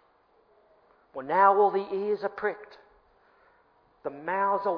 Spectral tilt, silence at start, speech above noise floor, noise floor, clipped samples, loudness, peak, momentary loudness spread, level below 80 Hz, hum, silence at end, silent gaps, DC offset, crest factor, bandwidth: -8 dB/octave; 1.15 s; 38 dB; -64 dBFS; under 0.1%; -26 LUFS; -8 dBFS; 20 LU; -74 dBFS; none; 0 s; none; under 0.1%; 22 dB; 5.4 kHz